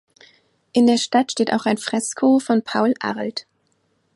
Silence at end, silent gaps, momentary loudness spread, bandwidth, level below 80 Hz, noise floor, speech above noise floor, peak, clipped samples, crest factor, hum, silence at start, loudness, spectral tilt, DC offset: 0.75 s; none; 9 LU; 11.5 kHz; -70 dBFS; -66 dBFS; 47 dB; -4 dBFS; under 0.1%; 16 dB; none; 0.75 s; -20 LUFS; -4 dB/octave; under 0.1%